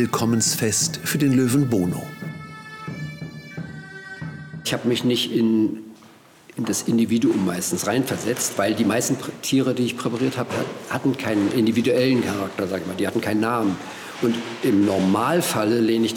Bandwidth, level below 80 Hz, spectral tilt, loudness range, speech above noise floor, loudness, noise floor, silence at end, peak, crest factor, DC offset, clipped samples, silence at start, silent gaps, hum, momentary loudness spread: 19 kHz; -64 dBFS; -4.5 dB/octave; 3 LU; 28 dB; -21 LUFS; -49 dBFS; 0 s; -10 dBFS; 12 dB; under 0.1%; under 0.1%; 0 s; none; none; 15 LU